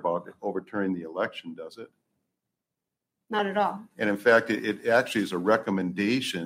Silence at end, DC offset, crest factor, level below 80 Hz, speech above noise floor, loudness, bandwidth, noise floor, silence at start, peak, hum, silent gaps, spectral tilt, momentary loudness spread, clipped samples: 0 s; under 0.1%; 20 dB; -76 dBFS; 60 dB; -27 LUFS; 16 kHz; -87 dBFS; 0 s; -8 dBFS; none; none; -5 dB/octave; 13 LU; under 0.1%